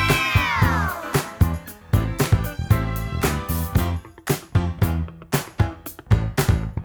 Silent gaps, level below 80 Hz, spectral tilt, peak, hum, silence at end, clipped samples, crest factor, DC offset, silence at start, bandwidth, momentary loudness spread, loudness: none; -30 dBFS; -5.5 dB/octave; -4 dBFS; none; 0 s; under 0.1%; 18 dB; under 0.1%; 0 s; over 20 kHz; 7 LU; -23 LUFS